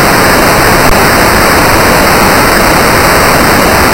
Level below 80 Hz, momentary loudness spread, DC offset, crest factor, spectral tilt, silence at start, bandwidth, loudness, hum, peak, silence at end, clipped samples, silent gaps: -18 dBFS; 0 LU; under 0.1%; 6 dB; -3.5 dB/octave; 0 s; over 20 kHz; -5 LUFS; none; 0 dBFS; 0 s; 3%; none